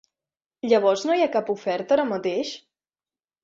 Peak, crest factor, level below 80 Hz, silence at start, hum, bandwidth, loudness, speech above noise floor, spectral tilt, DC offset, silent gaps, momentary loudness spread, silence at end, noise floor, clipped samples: -6 dBFS; 18 dB; -70 dBFS; 0.65 s; none; 7.8 kHz; -23 LUFS; over 68 dB; -4.5 dB/octave; under 0.1%; none; 12 LU; 0.85 s; under -90 dBFS; under 0.1%